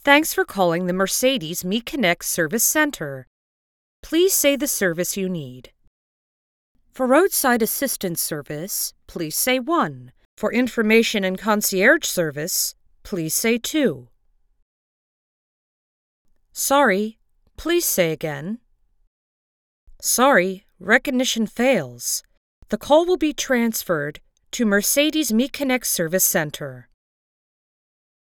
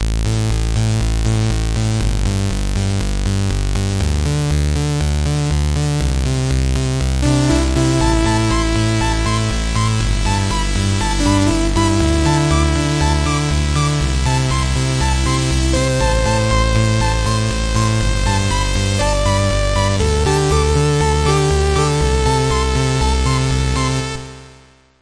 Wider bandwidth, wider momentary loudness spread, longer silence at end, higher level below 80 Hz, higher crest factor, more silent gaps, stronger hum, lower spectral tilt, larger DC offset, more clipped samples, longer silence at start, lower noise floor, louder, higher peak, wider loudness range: first, over 20 kHz vs 11 kHz; first, 13 LU vs 4 LU; first, 1.4 s vs 0.5 s; second, -54 dBFS vs -20 dBFS; first, 22 dB vs 14 dB; first, 3.27-4.03 s, 5.87-6.75 s, 10.25-10.37 s, 14.62-16.25 s, 19.07-19.87 s, 22.37-22.62 s vs none; neither; second, -3 dB/octave vs -5 dB/octave; neither; neither; about the same, 0.05 s vs 0 s; first, -61 dBFS vs -46 dBFS; second, -20 LUFS vs -17 LUFS; about the same, 0 dBFS vs 0 dBFS; about the same, 5 LU vs 3 LU